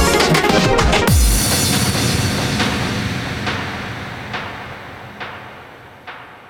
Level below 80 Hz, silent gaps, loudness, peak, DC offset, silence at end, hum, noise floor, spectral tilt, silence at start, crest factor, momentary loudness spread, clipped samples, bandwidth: -26 dBFS; none; -16 LUFS; 0 dBFS; under 0.1%; 0 s; none; -38 dBFS; -4 dB/octave; 0 s; 18 dB; 20 LU; under 0.1%; over 20 kHz